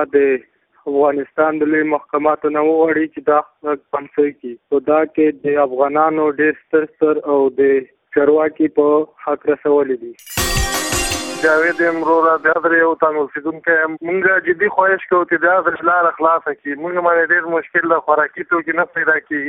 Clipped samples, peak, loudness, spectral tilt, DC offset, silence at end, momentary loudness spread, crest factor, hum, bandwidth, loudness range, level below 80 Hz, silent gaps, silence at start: under 0.1%; 0 dBFS; -16 LUFS; -4 dB/octave; under 0.1%; 0 s; 7 LU; 16 dB; none; 15.5 kHz; 2 LU; -40 dBFS; none; 0 s